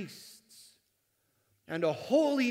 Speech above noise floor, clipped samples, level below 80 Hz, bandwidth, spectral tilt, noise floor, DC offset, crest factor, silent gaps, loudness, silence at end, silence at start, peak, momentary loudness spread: 47 dB; under 0.1%; -84 dBFS; 16 kHz; -5 dB/octave; -76 dBFS; under 0.1%; 18 dB; none; -30 LUFS; 0 s; 0 s; -14 dBFS; 24 LU